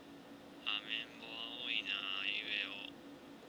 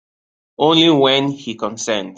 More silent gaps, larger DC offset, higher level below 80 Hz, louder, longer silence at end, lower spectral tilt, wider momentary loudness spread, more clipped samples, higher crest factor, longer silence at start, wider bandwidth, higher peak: neither; neither; second, -80 dBFS vs -60 dBFS; second, -39 LUFS vs -15 LUFS; about the same, 0 s vs 0.05 s; second, -2.5 dB/octave vs -4 dB/octave; first, 18 LU vs 13 LU; neither; first, 22 dB vs 16 dB; second, 0 s vs 0.6 s; first, over 20 kHz vs 9 kHz; second, -22 dBFS vs -2 dBFS